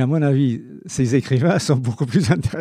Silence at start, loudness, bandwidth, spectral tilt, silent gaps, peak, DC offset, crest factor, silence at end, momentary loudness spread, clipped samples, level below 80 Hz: 0 s; -19 LUFS; 12.5 kHz; -6.5 dB/octave; none; -4 dBFS; under 0.1%; 14 dB; 0 s; 5 LU; under 0.1%; -46 dBFS